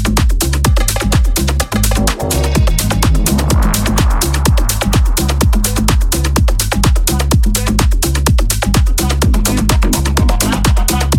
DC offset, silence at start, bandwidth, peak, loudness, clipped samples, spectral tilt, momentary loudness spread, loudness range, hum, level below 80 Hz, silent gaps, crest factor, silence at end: under 0.1%; 0 s; 18 kHz; 0 dBFS; -13 LUFS; under 0.1%; -4.5 dB/octave; 1 LU; 0 LU; none; -14 dBFS; none; 12 dB; 0 s